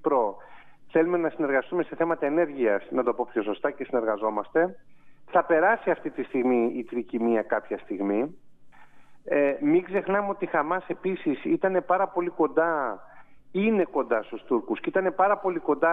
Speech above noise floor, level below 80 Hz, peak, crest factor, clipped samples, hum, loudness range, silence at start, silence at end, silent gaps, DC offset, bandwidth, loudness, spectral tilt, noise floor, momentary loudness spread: 22 dB; -70 dBFS; -8 dBFS; 18 dB; under 0.1%; none; 2 LU; 0 s; 0 s; none; under 0.1%; 3.9 kHz; -26 LUFS; -9 dB/octave; -47 dBFS; 7 LU